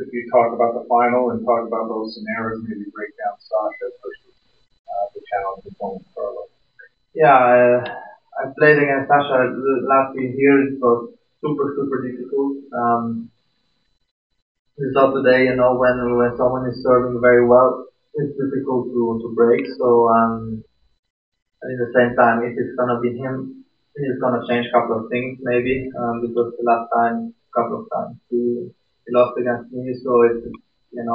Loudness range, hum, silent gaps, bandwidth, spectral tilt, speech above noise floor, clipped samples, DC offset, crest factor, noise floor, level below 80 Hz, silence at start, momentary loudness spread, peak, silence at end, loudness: 9 LU; none; 4.79-4.85 s, 14.11-14.30 s, 14.42-14.65 s, 20.99-21.03 s, 21.10-21.32 s, 21.42-21.46 s; 5.2 kHz; -10.5 dB/octave; 49 dB; under 0.1%; under 0.1%; 18 dB; -68 dBFS; -56 dBFS; 0 s; 16 LU; -2 dBFS; 0 s; -19 LUFS